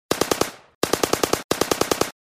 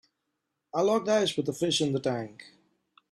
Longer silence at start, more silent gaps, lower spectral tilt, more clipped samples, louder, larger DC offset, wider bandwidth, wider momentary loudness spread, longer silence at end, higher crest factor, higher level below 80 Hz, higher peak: second, 0.1 s vs 0.75 s; first, 0.75-0.81 s, 1.44-1.49 s vs none; second, -3 dB/octave vs -4.5 dB/octave; neither; first, -23 LUFS vs -28 LUFS; neither; first, 16 kHz vs 14 kHz; second, 4 LU vs 10 LU; second, 0.15 s vs 0.65 s; about the same, 20 dB vs 16 dB; first, -50 dBFS vs -70 dBFS; first, -2 dBFS vs -14 dBFS